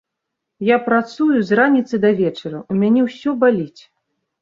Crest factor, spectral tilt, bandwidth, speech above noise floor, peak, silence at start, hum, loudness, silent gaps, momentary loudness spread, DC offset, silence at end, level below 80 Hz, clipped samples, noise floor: 16 dB; -7.5 dB/octave; 7.4 kHz; 63 dB; -2 dBFS; 0.6 s; none; -17 LUFS; none; 9 LU; under 0.1%; 0.75 s; -62 dBFS; under 0.1%; -79 dBFS